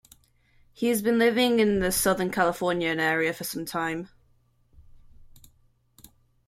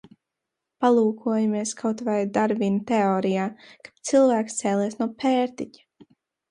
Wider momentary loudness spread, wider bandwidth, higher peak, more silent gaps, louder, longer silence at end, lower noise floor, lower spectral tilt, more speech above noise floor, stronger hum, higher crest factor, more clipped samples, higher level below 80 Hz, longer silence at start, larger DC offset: about the same, 10 LU vs 8 LU; first, 16 kHz vs 11.5 kHz; about the same, -8 dBFS vs -6 dBFS; neither; about the same, -25 LUFS vs -23 LUFS; first, 1.1 s vs 0.85 s; second, -64 dBFS vs -84 dBFS; second, -4 dB/octave vs -5.5 dB/octave; second, 39 dB vs 61 dB; neither; about the same, 18 dB vs 18 dB; neither; first, -54 dBFS vs -70 dBFS; about the same, 0.8 s vs 0.8 s; neither